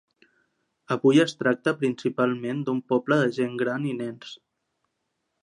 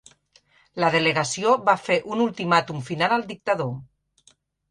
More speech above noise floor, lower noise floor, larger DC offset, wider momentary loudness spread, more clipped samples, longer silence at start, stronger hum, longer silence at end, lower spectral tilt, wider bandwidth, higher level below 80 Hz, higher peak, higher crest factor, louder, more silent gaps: first, 54 dB vs 38 dB; first, -78 dBFS vs -61 dBFS; neither; about the same, 12 LU vs 10 LU; neither; first, 0.9 s vs 0.75 s; neither; first, 1.05 s vs 0.85 s; first, -6 dB/octave vs -4.5 dB/octave; about the same, 10.5 kHz vs 11.5 kHz; second, -76 dBFS vs -64 dBFS; second, -8 dBFS vs -4 dBFS; about the same, 18 dB vs 20 dB; second, -25 LUFS vs -22 LUFS; neither